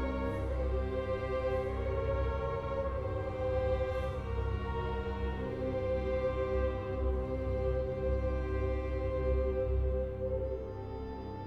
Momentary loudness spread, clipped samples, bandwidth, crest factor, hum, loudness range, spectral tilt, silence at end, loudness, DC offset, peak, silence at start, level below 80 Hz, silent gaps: 4 LU; under 0.1%; 5.8 kHz; 14 dB; none; 1 LU; -9 dB/octave; 0 s; -35 LUFS; under 0.1%; -20 dBFS; 0 s; -38 dBFS; none